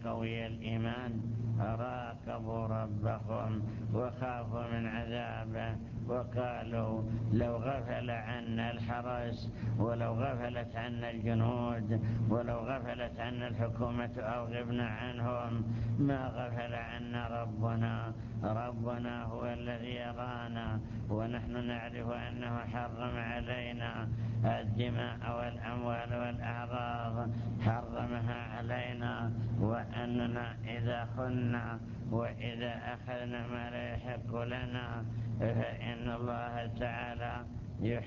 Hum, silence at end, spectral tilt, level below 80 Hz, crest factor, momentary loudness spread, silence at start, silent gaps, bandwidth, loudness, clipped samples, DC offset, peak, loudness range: none; 0 s; -6.5 dB/octave; -52 dBFS; 20 dB; 6 LU; 0 s; none; 6.8 kHz; -37 LUFS; under 0.1%; under 0.1%; -16 dBFS; 3 LU